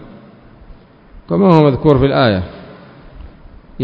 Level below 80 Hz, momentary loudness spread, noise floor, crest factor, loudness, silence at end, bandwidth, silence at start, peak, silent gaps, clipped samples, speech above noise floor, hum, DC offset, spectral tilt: -36 dBFS; 16 LU; -41 dBFS; 16 dB; -12 LUFS; 0 s; 6.2 kHz; 1.15 s; 0 dBFS; none; 0.2%; 30 dB; none; under 0.1%; -9.5 dB/octave